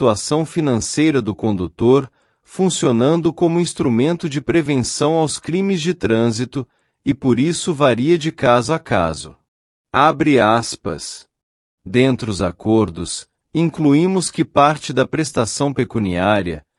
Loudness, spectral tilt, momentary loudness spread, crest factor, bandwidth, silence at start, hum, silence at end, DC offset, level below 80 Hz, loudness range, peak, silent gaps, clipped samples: -17 LUFS; -5.5 dB/octave; 11 LU; 16 dB; 12 kHz; 0 s; none; 0.2 s; under 0.1%; -48 dBFS; 2 LU; 0 dBFS; 9.48-9.85 s, 11.43-11.78 s; under 0.1%